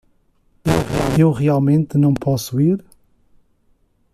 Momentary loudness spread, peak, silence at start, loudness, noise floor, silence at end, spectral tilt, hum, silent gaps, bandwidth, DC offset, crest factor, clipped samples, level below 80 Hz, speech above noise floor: 5 LU; -2 dBFS; 0.65 s; -17 LUFS; -59 dBFS; 1.35 s; -7.5 dB/octave; none; none; 14.5 kHz; under 0.1%; 16 dB; under 0.1%; -40 dBFS; 44 dB